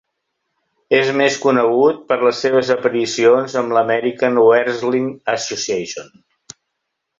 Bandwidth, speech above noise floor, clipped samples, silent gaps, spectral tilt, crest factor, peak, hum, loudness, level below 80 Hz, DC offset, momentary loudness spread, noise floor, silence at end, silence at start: 7.8 kHz; 60 dB; under 0.1%; none; -4 dB/octave; 16 dB; -2 dBFS; none; -16 LUFS; -64 dBFS; under 0.1%; 8 LU; -76 dBFS; 1.15 s; 0.9 s